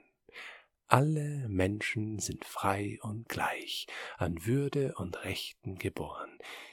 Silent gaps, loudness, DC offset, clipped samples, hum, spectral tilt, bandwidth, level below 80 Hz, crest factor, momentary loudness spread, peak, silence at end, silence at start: none; -34 LUFS; under 0.1%; under 0.1%; none; -5 dB/octave; 18.5 kHz; -60 dBFS; 32 dB; 15 LU; -4 dBFS; 0 s; 0.35 s